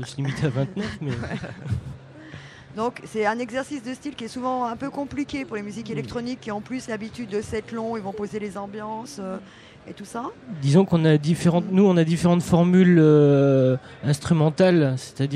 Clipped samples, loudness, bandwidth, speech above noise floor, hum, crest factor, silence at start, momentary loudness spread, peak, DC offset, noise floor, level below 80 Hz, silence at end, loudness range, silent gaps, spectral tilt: under 0.1%; -23 LUFS; 12 kHz; 20 dB; none; 18 dB; 0 s; 16 LU; -6 dBFS; under 0.1%; -42 dBFS; -52 dBFS; 0 s; 13 LU; none; -7.5 dB/octave